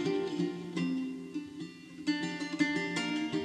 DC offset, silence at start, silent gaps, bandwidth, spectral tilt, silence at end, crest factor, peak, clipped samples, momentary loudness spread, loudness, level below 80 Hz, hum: under 0.1%; 0 s; none; 11 kHz; -5 dB/octave; 0 s; 18 dB; -16 dBFS; under 0.1%; 10 LU; -34 LUFS; -76 dBFS; none